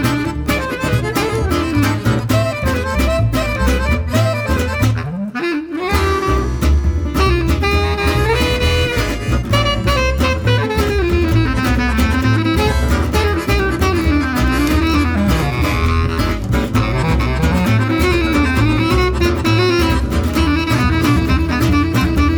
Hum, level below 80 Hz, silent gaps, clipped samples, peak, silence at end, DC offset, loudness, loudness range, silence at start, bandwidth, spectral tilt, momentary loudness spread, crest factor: none; -20 dBFS; none; under 0.1%; -4 dBFS; 0 s; under 0.1%; -16 LUFS; 2 LU; 0 s; over 20 kHz; -6 dB/octave; 3 LU; 12 dB